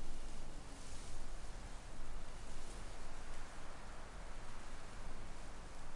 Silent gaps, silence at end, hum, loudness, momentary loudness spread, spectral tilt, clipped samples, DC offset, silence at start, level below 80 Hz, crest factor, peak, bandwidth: none; 0 s; none; -54 LUFS; 2 LU; -4 dB/octave; under 0.1%; under 0.1%; 0 s; -48 dBFS; 12 dB; -28 dBFS; 11.5 kHz